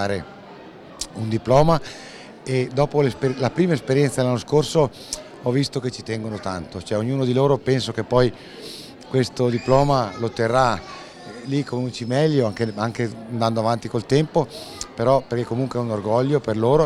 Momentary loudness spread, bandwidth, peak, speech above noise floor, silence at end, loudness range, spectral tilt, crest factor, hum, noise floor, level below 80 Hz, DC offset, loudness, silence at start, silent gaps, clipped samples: 17 LU; 13 kHz; -2 dBFS; 20 dB; 0 s; 2 LU; -6.5 dB/octave; 18 dB; none; -41 dBFS; -46 dBFS; under 0.1%; -22 LUFS; 0 s; none; under 0.1%